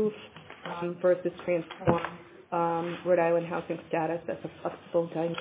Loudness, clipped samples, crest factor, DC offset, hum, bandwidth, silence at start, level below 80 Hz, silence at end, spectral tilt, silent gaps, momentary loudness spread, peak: -30 LUFS; under 0.1%; 22 dB; under 0.1%; none; 4 kHz; 0 s; -60 dBFS; 0 s; -10.5 dB/octave; none; 13 LU; -8 dBFS